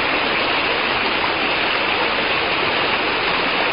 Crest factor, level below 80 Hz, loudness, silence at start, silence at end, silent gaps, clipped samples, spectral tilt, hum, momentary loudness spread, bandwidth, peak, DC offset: 14 dB; -46 dBFS; -17 LUFS; 0 s; 0 s; none; under 0.1%; -8 dB/octave; none; 1 LU; 5.4 kHz; -6 dBFS; 0.3%